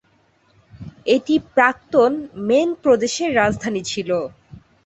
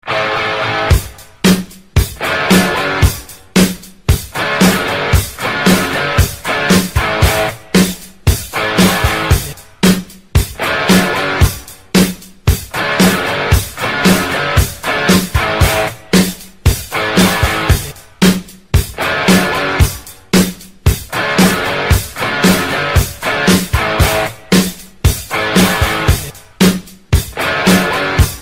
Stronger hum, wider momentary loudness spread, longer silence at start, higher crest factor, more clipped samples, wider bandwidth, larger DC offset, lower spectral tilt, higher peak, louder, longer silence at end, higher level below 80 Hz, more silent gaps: neither; about the same, 8 LU vs 6 LU; first, 0.75 s vs 0.05 s; about the same, 18 dB vs 14 dB; neither; second, 8.2 kHz vs 16.5 kHz; second, under 0.1% vs 0.7%; about the same, -4.5 dB/octave vs -4.5 dB/octave; about the same, -2 dBFS vs 0 dBFS; second, -19 LUFS vs -13 LUFS; first, 0.3 s vs 0 s; second, -52 dBFS vs -22 dBFS; neither